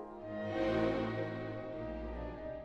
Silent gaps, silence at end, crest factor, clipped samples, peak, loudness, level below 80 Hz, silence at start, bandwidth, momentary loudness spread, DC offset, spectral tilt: none; 0 s; 16 dB; under 0.1%; -22 dBFS; -38 LUFS; -52 dBFS; 0 s; 8 kHz; 10 LU; under 0.1%; -8 dB/octave